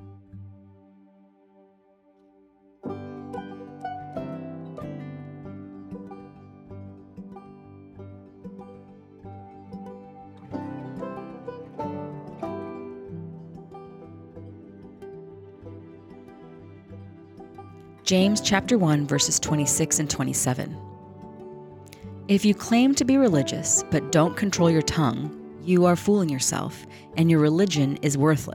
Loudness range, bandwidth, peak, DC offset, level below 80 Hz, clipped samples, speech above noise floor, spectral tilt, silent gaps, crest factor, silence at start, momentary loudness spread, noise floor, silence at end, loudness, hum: 22 LU; 18.5 kHz; -6 dBFS; under 0.1%; -58 dBFS; under 0.1%; 38 dB; -4.5 dB/octave; none; 22 dB; 0 s; 24 LU; -60 dBFS; 0 s; -23 LUFS; none